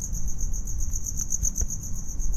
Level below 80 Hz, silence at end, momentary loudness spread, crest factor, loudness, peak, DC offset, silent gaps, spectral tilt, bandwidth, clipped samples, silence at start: -28 dBFS; 0 s; 7 LU; 12 dB; -30 LUFS; -12 dBFS; under 0.1%; none; -3.5 dB/octave; 14 kHz; under 0.1%; 0 s